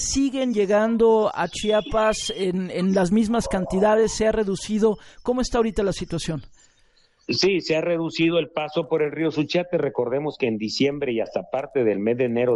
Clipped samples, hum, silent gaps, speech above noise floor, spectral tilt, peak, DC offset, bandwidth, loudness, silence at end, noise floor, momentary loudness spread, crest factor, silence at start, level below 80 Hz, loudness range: under 0.1%; none; none; 38 dB; -5 dB/octave; -8 dBFS; under 0.1%; 11.5 kHz; -22 LUFS; 0 s; -59 dBFS; 7 LU; 14 dB; 0 s; -44 dBFS; 3 LU